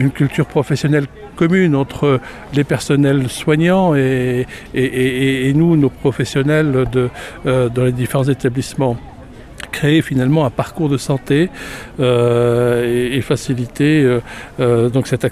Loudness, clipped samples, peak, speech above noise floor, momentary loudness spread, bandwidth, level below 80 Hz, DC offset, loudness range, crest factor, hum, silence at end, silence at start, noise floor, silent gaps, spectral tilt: -16 LUFS; under 0.1%; -2 dBFS; 20 dB; 7 LU; 14.5 kHz; -40 dBFS; under 0.1%; 2 LU; 12 dB; none; 0 s; 0 s; -35 dBFS; none; -7 dB/octave